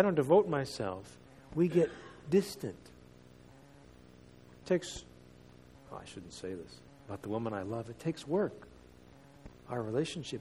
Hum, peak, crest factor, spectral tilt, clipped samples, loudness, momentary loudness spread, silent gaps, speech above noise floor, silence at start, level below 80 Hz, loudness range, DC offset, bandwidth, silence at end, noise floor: none; -12 dBFS; 24 dB; -6.5 dB/octave; under 0.1%; -34 LUFS; 25 LU; none; 24 dB; 0 s; -64 dBFS; 8 LU; under 0.1%; 14.5 kHz; 0 s; -57 dBFS